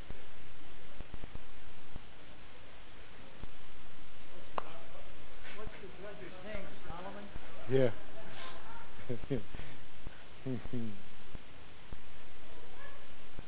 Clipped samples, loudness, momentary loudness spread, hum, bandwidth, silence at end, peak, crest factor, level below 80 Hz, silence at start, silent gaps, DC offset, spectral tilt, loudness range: under 0.1%; -44 LUFS; 15 LU; none; 4 kHz; 0 s; -14 dBFS; 20 dB; -56 dBFS; 0 s; none; 4%; -9 dB/octave; 14 LU